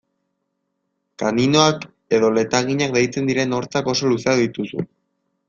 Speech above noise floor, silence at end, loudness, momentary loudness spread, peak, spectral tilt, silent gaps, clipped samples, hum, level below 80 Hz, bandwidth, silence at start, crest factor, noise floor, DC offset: 56 dB; 0.65 s; -19 LUFS; 11 LU; -2 dBFS; -4.5 dB/octave; none; under 0.1%; none; -56 dBFS; 7.6 kHz; 1.2 s; 20 dB; -74 dBFS; under 0.1%